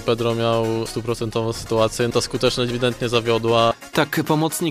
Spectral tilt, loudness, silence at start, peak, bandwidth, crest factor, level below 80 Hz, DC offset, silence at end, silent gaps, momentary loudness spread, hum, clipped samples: -5 dB/octave; -20 LUFS; 0 s; -2 dBFS; 15.5 kHz; 20 dB; -44 dBFS; under 0.1%; 0 s; none; 6 LU; none; under 0.1%